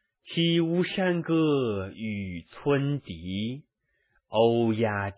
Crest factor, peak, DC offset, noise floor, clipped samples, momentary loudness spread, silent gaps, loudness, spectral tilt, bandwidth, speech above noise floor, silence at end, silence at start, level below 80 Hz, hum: 18 dB; -10 dBFS; under 0.1%; -72 dBFS; under 0.1%; 11 LU; none; -27 LUFS; -10.5 dB/octave; 4 kHz; 46 dB; 0.05 s; 0.25 s; -56 dBFS; none